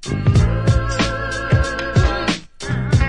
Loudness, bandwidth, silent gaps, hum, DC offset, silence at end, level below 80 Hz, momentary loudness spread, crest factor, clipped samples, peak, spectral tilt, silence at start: -18 LUFS; 10.5 kHz; none; none; under 0.1%; 0 s; -24 dBFS; 7 LU; 14 dB; under 0.1%; -2 dBFS; -6 dB/octave; 0 s